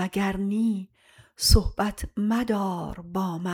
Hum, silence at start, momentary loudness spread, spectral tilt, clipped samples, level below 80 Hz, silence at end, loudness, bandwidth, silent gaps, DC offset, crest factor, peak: none; 0 s; 12 LU; -5 dB/octave; under 0.1%; -32 dBFS; 0 s; -26 LUFS; 18 kHz; none; under 0.1%; 22 dB; -4 dBFS